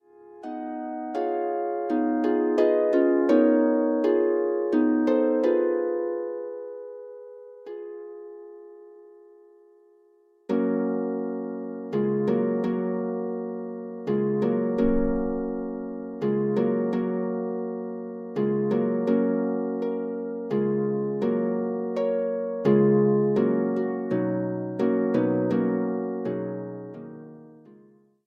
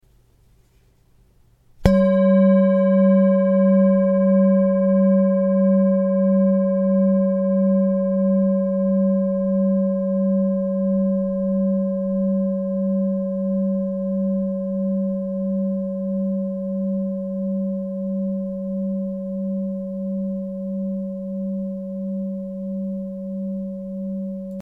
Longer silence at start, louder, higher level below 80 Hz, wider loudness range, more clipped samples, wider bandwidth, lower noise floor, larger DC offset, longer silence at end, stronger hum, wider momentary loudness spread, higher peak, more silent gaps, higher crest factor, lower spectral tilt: second, 0.2 s vs 1.8 s; second, -25 LUFS vs -20 LUFS; about the same, -50 dBFS vs -46 dBFS; about the same, 10 LU vs 11 LU; neither; first, 6.6 kHz vs 5.2 kHz; about the same, -60 dBFS vs -57 dBFS; neither; first, 0.55 s vs 0 s; neither; first, 17 LU vs 12 LU; second, -8 dBFS vs 0 dBFS; neither; about the same, 18 dB vs 20 dB; about the same, -10 dB/octave vs -11 dB/octave